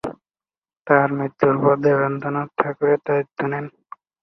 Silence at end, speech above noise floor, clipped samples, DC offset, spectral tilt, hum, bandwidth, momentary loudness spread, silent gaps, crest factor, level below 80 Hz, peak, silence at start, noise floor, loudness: 0.55 s; over 71 dB; under 0.1%; under 0.1%; -9.5 dB/octave; none; 6 kHz; 9 LU; 0.58-0.62 s; 20 dB; -62 dBFS; -2 dBFS; 0.05 s; under -90 dBFS; -20 LUFS